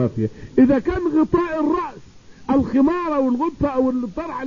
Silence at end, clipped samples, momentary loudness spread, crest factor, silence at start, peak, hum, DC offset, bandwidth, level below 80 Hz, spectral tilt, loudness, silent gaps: 0 s; under 0.1%; 9 LU; 14 dB; 0 s; -4 dBFS; none; 0.4%; 7.2 kHz; -42 dBFS; -8.5 dB/octave; -20 LUFS; none